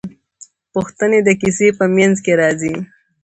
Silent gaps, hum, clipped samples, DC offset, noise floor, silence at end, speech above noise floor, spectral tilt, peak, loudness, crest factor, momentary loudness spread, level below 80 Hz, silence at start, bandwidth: none; none; under 0.1%; under 0.1%; -45 dBFS; 0.4 s; 31 dB; -5.5 dB/octave; 0 dBFS; -15 LUFS; 16 dB; 13 LU; -52 dBFS; 0.05 s; 9 kHz